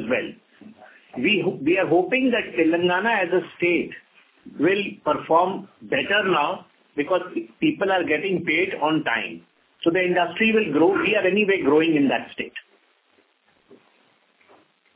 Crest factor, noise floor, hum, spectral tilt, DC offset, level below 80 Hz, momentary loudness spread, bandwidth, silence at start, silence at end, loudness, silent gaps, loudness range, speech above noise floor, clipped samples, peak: 18 dB; -63 dBFS; none; -9 dB/octave; under 0.1%; -64 dBFS; 14 LU; 4 kHz; 0 s; 1.2 s; -21 LUFS; none; 3 LU; 41 dB; under 0.1%; -6 dBFS